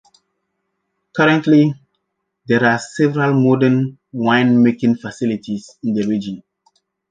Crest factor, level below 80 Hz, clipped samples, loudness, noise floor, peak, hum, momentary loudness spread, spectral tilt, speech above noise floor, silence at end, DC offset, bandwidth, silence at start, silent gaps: 16 dB; -60 dBFS; under 0.1%; -16 LUFS; -74 dBFS; -2 dBFS; none; 12 LU; -7 dB/octave; 58 dB; 0.7 s; under 0.1%; 9.2 kHz; 1.15 s; none